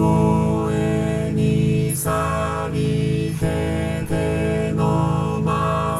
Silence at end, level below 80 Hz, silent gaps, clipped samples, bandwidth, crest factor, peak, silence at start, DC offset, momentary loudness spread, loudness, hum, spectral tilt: 0 s; -36 dBFS; none; under 0.1%; 14 kHz; 14 dB; -6 dBFS; 0 s; under 0.1%; 4 LU; -21 LUFS; none; -7 dB/octave